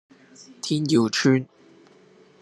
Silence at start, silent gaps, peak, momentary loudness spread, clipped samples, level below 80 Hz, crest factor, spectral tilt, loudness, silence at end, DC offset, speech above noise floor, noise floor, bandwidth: 0.4 s; none; -6 dBFS; 14 LU; under 0.1%; -70 dBFS; 18 dB; -5 dB/octave; -22 LUFS; 1 s; under 0.1%; 32 dB; -54 dBFS; 12 kHz